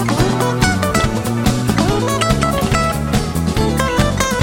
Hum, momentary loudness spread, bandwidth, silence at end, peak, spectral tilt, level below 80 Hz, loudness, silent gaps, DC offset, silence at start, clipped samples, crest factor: none; 2 LU; 16.5 kHz; 0 s; 0 dBFS; -5 dB/octave; -26 dBFS; -16 LUFS; none; 0.3%; 0 s; under 0.1%; 16 dB